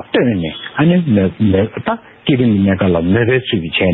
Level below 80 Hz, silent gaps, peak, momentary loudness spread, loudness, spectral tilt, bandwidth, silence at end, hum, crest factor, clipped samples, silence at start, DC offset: -42 dBFS; none; -2 dBFS; 8 LU; -14 LUFS; -11.5 dB/octave; 4.2 kHz; 0 s; none; 12 dB; under 0.1%; 0 s; under 0.1%